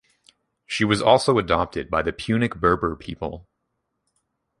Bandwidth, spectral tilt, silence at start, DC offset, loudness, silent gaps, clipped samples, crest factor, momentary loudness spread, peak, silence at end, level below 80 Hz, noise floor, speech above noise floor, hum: 11.5 kHz; -5.5 dB/octave; 0.7 s; under 0.1%; -22 LUFS; none; under 0.1%; 22 dB; 15 LU; -2 dBFS; 1.2 s; -44 dBFS; -77 dBFS; 55 dB; none